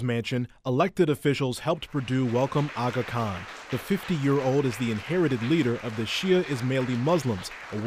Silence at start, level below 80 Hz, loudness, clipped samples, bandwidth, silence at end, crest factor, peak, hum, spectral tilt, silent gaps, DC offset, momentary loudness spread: 0 s; -56 dBFS; -27 LUFS; under 0.1%; 15.5 kHz; 0 s; 16 dB; -10 dBFS; none; -6.5 dB/octave; none; under 0.1%; 7 LU